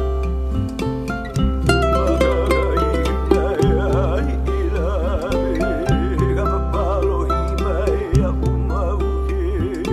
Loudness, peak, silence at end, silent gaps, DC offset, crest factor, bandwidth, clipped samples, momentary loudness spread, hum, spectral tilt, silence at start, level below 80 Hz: -20 LUFS; 0 dBFS; 0 s; none; under 0.1%; 18 dB; 11.5 kHz; under 0.1%; 5 LU; none; -7.5 dB/octave; 0 s; -22 dBFS